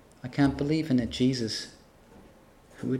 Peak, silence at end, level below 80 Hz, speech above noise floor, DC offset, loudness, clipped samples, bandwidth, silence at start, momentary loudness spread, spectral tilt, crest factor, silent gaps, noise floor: -12 dBFS; 0 s; -52 dBFS; 28 dB; under 0.1%; -28 LUFS; under 0.1%; 13 kHz; 0.25 s; 11 LU; -6 dB/octave; 18 dB; none; -55 dBFS